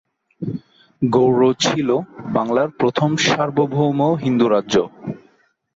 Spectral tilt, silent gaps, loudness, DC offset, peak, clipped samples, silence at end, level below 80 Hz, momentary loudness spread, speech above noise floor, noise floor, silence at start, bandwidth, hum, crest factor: -5.5 dB/octave; none; -18 LUFS; under 0.1%; -4 dBFS; under 0.1%; 0.6 s; -58 dBFS; 13 LU; 41 dB; -58 dBFS; 0.4 s; 7.8 kHz; none; 14 dB